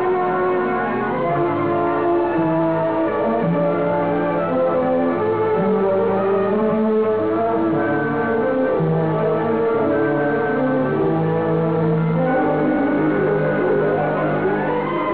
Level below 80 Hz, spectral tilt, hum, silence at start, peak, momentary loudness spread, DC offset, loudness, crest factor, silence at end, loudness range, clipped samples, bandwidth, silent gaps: -52 dBFS; -11.5 dB/octave; none; 0 s; -8 dBFS; 2 LU; 0.5%; -19 LUFS; 10 dB; 0 s; 1 LU; under 0.1%; 4 kHz; none